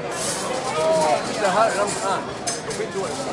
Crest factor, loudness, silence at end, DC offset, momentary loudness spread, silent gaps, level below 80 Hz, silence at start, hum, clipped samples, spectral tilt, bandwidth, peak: 18 dB; -22 LUFS; 0 s; under 0.1%; 7 LU; none; -56 dBFS; 0 s; none; under 0.1%; -3 dB/octave; 11.5 kHz; -6 dBFS